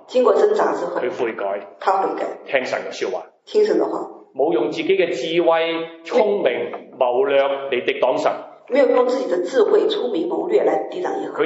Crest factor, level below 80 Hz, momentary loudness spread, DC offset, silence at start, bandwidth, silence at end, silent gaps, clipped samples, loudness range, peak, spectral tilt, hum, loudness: 18 dB; -82 dBFS; 9 LU; under 0.1%; 0.1 s; 8 kHz; 0 s; none; under 0.1%; 3 LU; -2 dBFS; -4.5 dB/octave; none; -20 LUFS